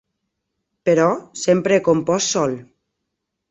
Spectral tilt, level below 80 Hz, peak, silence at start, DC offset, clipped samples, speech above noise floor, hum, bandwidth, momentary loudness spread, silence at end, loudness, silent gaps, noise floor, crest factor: -4.5 dB/octave; -60 dBFS; -2 dBFS; 0.85 s; under 0.1%; under 0.1%; 60 dB; none; 8.2 kHz; 8 LU; 0.85 s; -18 LUFS; none; -78 dBFS; 18 dB